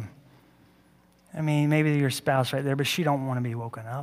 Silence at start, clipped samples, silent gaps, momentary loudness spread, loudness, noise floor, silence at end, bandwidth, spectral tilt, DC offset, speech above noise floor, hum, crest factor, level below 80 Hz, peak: 0 s; under 0.1%; none; 12 LU; -26 LUFS; -60 dBFS; 0 s; 16 kHz; -6 dB/octave; under 0.1%; 34 dB; none; 18 dB; -68 dBFS; -10 dBFS